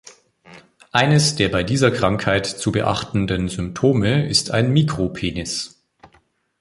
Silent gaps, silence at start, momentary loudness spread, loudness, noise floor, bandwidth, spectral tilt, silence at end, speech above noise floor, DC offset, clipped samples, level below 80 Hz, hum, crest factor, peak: none; 0.05 s; 9 LU; -19 LUFS; -59 dBFS; 11.5 kHz; -5 dB/octave; 0.95 s; 41 dB; under 0.1%; under 0.1%; -42 dBFS; none; 18 dB; -2 dBFS